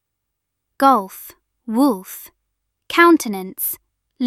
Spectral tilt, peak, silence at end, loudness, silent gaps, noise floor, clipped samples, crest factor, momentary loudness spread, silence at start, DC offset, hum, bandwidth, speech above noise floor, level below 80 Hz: -3.5 dB/octave; -2 dBFS; 0 s; -17 LUFS; none; -78 dBFS; under 0.1%; 18 dB; 22 LU; 0.8 s; under 0.1%; none; 16 kHz; 61 dB; -64 dBFS